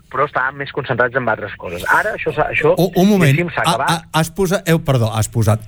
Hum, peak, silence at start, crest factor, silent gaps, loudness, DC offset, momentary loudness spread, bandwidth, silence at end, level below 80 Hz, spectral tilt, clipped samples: none; -2 dBFS; 0.1 s; 14 dB; none; -16 LUFS; under 0.1%; 7 LU; over 20 kHz; 0 s; -42 dBFS; -5.5 dB/octave; under 0.1%